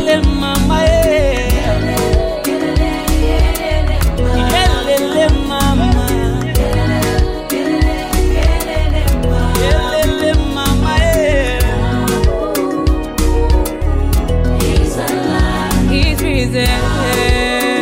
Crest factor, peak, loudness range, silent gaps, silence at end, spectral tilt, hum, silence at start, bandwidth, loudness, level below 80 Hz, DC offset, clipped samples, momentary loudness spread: 12 dB; 0 dBFS; 1 LU; none; 0 s; -5.5 dB/octave; none; 0 s; 16.5 kHz; -14 LUFS; -16 dBFS; under 0.1%; under 0.1%; 4 LU